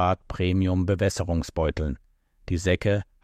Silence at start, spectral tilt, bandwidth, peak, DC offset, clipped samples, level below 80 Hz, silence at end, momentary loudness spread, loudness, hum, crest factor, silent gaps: 0 s; -6.5 dB/octave; 13 kHz; -10 dBFS; under 0.1%; under 0.1%; -38 dBFS; 0.2 s; 8 LU; -26 LUFS; none; 14 dB; none